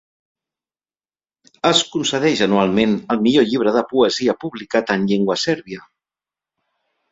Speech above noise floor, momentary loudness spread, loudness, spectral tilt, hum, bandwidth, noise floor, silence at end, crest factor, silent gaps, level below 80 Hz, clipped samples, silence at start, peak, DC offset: over 73 dB; 6 LU; -18 LUFS; -4.5 dB/octave; none; 8 kHz; under -90 dBFS; 1.3 s; 18 dB; none; -56 dBFS; under 0.1%; 1.65 s; -2 dBFS; under 0.1%